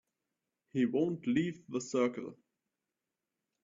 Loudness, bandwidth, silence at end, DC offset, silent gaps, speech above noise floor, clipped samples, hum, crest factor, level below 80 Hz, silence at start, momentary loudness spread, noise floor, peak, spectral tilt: -34 LUFS; 7.6 kHz; 1.3 s; under 0.1%; none; 56 dB; under 0.1%; none; 18 dB; -76 dBFS; 0.75 s; 10 LU; -89 dBFS; -18 dBFS; -6 dB/octave